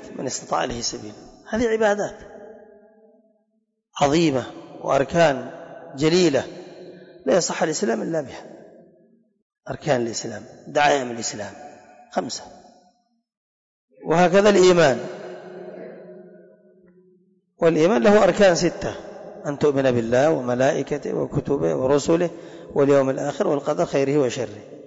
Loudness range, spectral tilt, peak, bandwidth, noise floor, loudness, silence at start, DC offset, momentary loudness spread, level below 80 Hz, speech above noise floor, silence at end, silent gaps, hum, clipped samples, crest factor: 7 LU; -5 dB/octave; -8 dBFS; 8 kHz; -72 dBFS; -21 LUFS; 0 s; under 0.1%; 22 LU; -52 dBFS; 52 dB; 0.05 s; 9.42-9.50 s, 13.37-13.88 s; none; under 0.1%; 14 dB